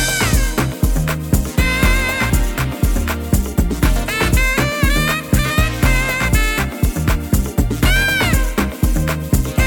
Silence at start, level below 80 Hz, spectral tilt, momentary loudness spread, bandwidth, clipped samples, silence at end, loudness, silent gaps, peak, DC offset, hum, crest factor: 0 s; -20 dBFS; -4.5 dB/octave; 5 LU; 17.5 kHz; under 0.1%; 0 s; -17 LUFS; none; -2 dBFS; under 0.1%; none; 14 dB